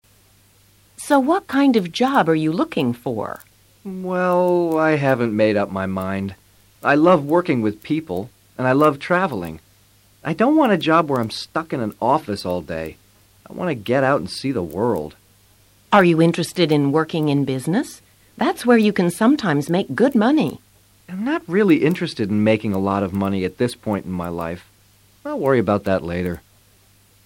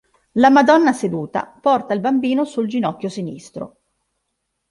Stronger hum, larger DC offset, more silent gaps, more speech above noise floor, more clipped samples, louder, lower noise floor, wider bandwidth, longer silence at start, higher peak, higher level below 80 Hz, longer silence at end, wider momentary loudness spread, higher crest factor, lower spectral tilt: neither; neither; neither; second, 36 dB vs 57 dB; neither; about the same, -19 LUFS vs -17 LUFS; second, -54 dBFS vs -74 dBFS; first, 16.5 kHz vs 11.5 kHz; first, 1 s vs 0.35 s; about the same, -4 dBFS vs -2 dBFS; first, -54 dBFS vs -62 dBFS; second, 0.85 s vs 1.05 s; second, 14 LU vs 19 LU; about the same, 16 dB vs 18 dB; about the same, -6.5 dB/octave vs -6 dB/octave